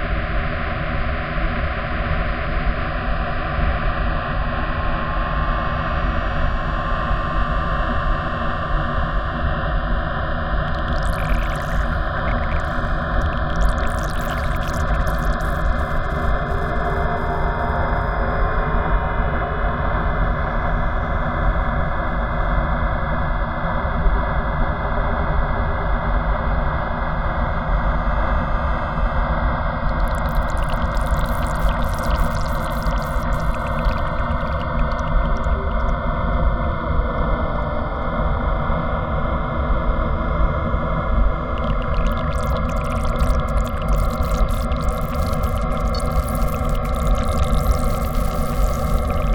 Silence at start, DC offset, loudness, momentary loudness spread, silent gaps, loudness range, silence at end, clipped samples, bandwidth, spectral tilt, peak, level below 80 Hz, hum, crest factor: 0 s; under 0.1%; -22 LUFS; 2 LU; none; 1 LU; 0 s; under 0.1%; 18 kHz; -6.5 dB/octave; -4 dBFS; -22 dBFS; none; 16 dB